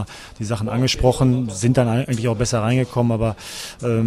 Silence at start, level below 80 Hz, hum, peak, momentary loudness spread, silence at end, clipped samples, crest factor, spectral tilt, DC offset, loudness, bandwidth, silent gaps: 0 s; -36 dBFS; none; -2 dBFS; 11 LU; 0 s; under 0.1%; 18 dB; -6 dB/octave; under 0.1%; -20 LUFS; 14.5 kHz; none